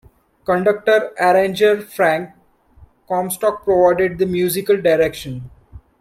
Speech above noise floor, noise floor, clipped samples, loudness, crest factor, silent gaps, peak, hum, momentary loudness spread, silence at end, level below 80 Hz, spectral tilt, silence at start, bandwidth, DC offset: 32 dB; -49 dBFS; under 0.1%; -17 LUFS; 16 dB; none; -2 dBFS; none; 11 LU; 0.2 s; -50 dBFS; -5 dB/octave; 0.5 s; 16 kHz; under 0.1%